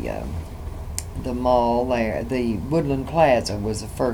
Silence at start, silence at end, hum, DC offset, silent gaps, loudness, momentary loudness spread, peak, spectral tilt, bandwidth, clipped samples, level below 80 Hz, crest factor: 0 s; 0 s; none; under 0.1%; none; -23 LUFS; 13 LU; -4 dBFS; -6 dB/octave; over 20 kHz; under 0.1%; -36 dBFS; 20 dB